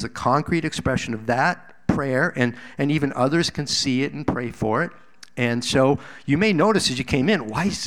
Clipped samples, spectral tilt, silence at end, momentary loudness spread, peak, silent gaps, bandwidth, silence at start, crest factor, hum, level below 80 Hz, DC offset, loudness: under 0.1%; -5 dB/octave; 0 s; 7 LU; -4 dBFS; none; 15.5 kHz; 0 s; 18 dB; none; -46 dBFS; 0.5%; -22 LUFS